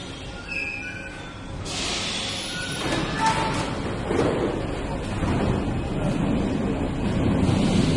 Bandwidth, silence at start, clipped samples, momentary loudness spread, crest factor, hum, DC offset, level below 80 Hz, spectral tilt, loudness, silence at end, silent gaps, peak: 11.5 kHz; 0 s; under 0.1%; 10 LU; 16 dB; none; under 0.1%; -36 dBFS; -5 dB/octave; -25 LUFS; 0 s; none; -8 dBFS